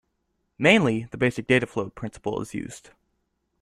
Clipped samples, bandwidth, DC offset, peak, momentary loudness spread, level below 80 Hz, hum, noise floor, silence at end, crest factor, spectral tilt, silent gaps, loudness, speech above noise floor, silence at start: under 0.1%; 13 kHz; under 0.1%; -4 dBFS; 16 LU; -56 dBFS; none; -75 dBFS; 0.85 s; 22 dB; -5.5 dB/octave; none; -24 LUFS; 51 dB; 0.6 s